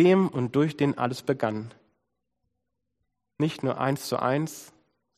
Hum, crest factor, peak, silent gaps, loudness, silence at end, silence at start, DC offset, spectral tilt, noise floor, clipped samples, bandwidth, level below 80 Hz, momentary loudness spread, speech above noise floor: none; 18 dB; -8 dBFS; none; -27 LUFS; 0.55 s; 0 s; under 0.1%; -6.5 dB/octave; -81 dBFS; under 0.1%; 15 kHz; -70 dBFS; 11 LU; 56 dB